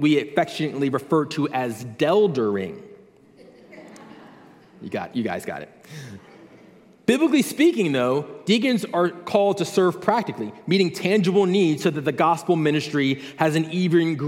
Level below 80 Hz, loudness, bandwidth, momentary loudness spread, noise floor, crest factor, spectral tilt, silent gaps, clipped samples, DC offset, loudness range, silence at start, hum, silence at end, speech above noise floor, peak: -70 dBFS; -22 LUFS; 16 kHz; 13 LU; -50 dBFS; 18 dB; -6 dB/octave; none; under 0.1%; under 0.1%; 13 LU; 0 s; none; 0 s; 29 dB; -4 dBFS